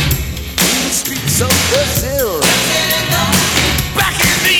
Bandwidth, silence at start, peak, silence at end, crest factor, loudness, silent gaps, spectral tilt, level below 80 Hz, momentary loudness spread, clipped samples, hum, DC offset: over 20 kHz; 0 s; -2 dBFS; 0 s; 12 dB; -13 LUFS; none; -2.5 dB/octave; -28 dBFS; 4 LU; under 0.1%; none; under 0.1%